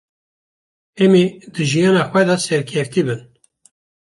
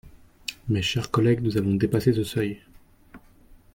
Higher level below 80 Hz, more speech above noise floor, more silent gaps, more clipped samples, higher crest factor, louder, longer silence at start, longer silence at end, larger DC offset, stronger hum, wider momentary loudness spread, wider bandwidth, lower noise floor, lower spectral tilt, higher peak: second, -60 dBFS vs -52 dBFS; first, over 74 dB vs 29 dB; neither; neither; about the same, 16 dB vs 18 dB; first, -16 LUFS vs -24 LUFS; first, 0.95 s vs 0.05 s; first, 0.85 s vs 0.2 s; neither; neither; second, 9 LU vs 14 LU; second, 11.5 kHz vs 17 kHz; first, under -90 dBFS vs -53 dBFS; about the same, -5.5 dB/octave vs -6.5 dB/octave; first, -2 dBFS vs -8 dBFS